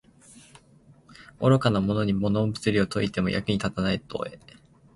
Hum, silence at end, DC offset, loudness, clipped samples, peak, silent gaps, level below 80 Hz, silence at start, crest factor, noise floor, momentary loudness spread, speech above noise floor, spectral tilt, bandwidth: none; 0.6 s; under 0.1%; -25 LUFS; under 0.1%; -8 dBFS; none; -50 dBFS; 0.35 s; 20 dB; -56 dBFS; 8 LU; 31 dB; -6.5 dB/octave; 11.5 kHz